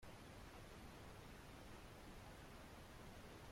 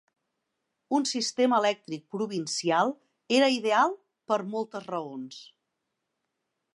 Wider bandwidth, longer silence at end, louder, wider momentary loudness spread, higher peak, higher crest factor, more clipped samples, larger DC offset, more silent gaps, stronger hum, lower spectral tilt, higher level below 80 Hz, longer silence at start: first, 16.5 kHz vs 11.5 kHz; second, 0 s vs 1.3 s; second, -59 LUFS vs -27 LUFS; second, 1 LU vs 16 LU; second, -46 dBFS vs -10 dBFS; second, 12 dB vs 18 dB; neither; neither; neither; neither; about the same, -4.5 dB/octave vs -3.5 dB/octave; first, -64 dBFS vs -84 dBFS; second, 0 s vs 0.9 s